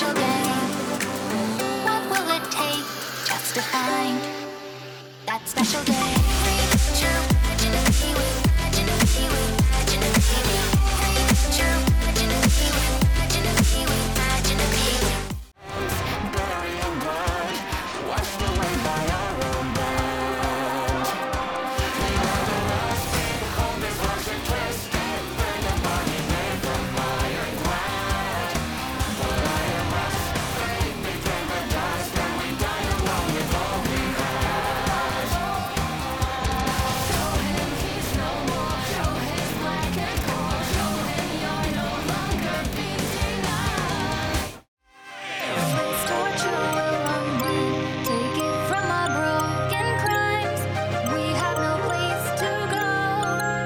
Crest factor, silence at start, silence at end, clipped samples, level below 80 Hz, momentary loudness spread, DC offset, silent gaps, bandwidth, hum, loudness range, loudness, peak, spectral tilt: 14 dB; 0 s; 0 s; under 0.1%; -30 dBFS; 6 LU; under 0.1%; 44.68-44.77 s; over 20 kHz; none; 5 LU; -24 LUFS; -8 dBFS; -4 dB/octave